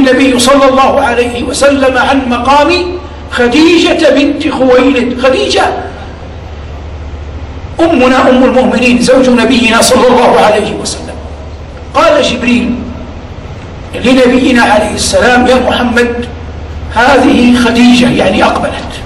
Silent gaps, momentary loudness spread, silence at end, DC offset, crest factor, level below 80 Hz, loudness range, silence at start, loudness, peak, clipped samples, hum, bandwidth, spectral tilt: none; 19 LU; 0 s; under 0.1%; 8 dB; -26 dBFS; 5 LU; 0 s; -7 LUFS; 0 dBFS; 0.3%; none; 15 kHz; -4.5 dB/octave